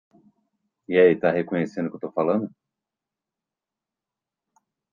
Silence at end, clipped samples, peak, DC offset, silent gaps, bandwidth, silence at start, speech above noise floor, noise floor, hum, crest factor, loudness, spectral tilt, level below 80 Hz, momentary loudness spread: 2.45 s; under 0.1%; -4 dBFS; under 0.1%; none; 7.2 kHz; 0.9 s; 66 dB; -88 dBFS; none; 22 dB; -22 LUFS; -8 dB/octave; -70 dBFS; 11 LU